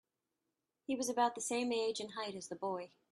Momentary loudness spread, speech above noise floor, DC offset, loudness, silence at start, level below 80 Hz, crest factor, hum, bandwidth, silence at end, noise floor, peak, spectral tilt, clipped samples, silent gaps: 9 LU; 50 dB; under 0.1%; -38 LUFS; 0.9 s; -84 dBFS; 18 dB; none; 13.5 kHz; 0.25 s; -88 dBFS; -20 dBFS; -2.5 dB/octave; under 0.1%; none